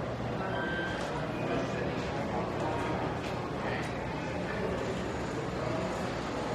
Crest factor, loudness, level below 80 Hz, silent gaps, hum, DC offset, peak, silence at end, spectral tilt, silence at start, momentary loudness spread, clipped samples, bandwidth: 14 dB; -34 LUFS; -50 dBFS; none; none; under 0.1%; -20 dBFS; 0 s; -6 dB/octave; 0 s; 3 LU; under 0.1%; 13 kHz